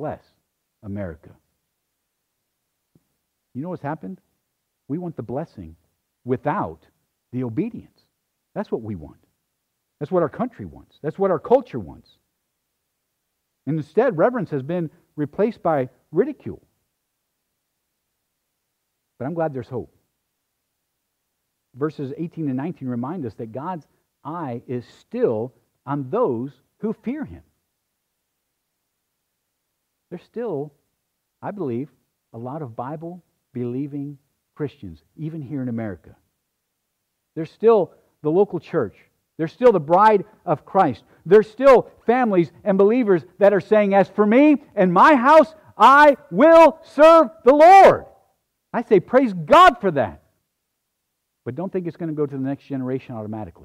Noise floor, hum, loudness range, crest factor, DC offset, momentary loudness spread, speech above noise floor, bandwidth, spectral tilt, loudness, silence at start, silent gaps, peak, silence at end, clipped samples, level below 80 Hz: -76 dBFS; none; 20 LU; 16 dB; under 0.1%; 21 LU; 58 dB; 13.5 kHz; -7 dB/octave; -18 LUFS; 0 s; none; -4 dBFS; 0.15 s; under 0.1%; -56 dBFS